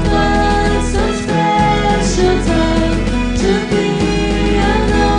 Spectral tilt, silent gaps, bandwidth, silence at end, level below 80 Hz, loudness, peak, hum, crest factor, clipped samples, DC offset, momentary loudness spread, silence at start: -5.5 dB/octave; none; 10.5 kHz; 0 s; -20 dBFS; -14 LUFS; 0 dBFS; none; 12 dB; under 0.1%; under 0.1%; 3 LU; 0 s